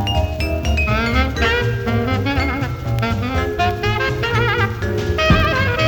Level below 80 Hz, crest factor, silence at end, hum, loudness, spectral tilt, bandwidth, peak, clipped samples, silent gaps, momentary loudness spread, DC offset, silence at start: -26 dBFS; 16 dB; 0 s; none; -18 LUFS; -6 dB/octave; 19 kHz; -2 dBFS; under 0.1%; none; 6 LU; under 0.1%; 0 s